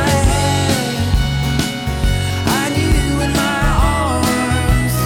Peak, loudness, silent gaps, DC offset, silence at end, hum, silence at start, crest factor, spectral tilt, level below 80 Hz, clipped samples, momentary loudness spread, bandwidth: -2 dBFS; -16 LUFS; none; under 0.1%; 0 s; none; 0 s; 12 dB; -5 dB/octave; -22 dBFS; under 0.1%; 3 LU; 18.5 kHz